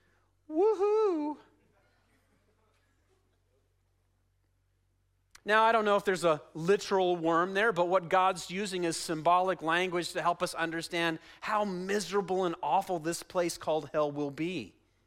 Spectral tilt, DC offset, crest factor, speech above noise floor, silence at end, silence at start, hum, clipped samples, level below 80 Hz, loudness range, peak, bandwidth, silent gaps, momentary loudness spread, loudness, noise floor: -4.5 dB/octave; under 0.1%; 18 dB; 43 dB; 0.4 s; 0.5 s; none; under 0.1%; -70 dBFS; 5 LU; -12 dBFS; 16 kHz; none; 8 LU; -30 LUFS; -73 dBFS